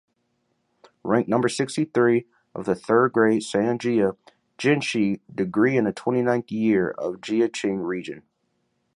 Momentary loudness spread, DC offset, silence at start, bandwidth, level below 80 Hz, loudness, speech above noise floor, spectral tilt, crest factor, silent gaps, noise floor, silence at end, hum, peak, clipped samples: 9 LU; under 0.1%; 1.05 s; 11.5 kHz; -64 dBFS; -23 LUFS; 50 dB; -6 dB/octave; 18 dB; none; -72 dBFS; 0.75 s; none; -4 dBFS; under 0.1%